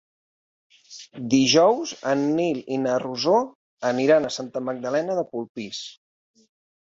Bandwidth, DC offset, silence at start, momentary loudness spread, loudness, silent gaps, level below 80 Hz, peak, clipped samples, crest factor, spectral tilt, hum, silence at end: 7.8 kHz; under 0.1%; 0.9 s; 17 LU; -23 LUFS; 3.55-3.77 s, 5.49-5.55 s; -66 dBFS; -6 dBFS; under 0.1%; 18 dB; -4 dB/octave; none; 0.9 s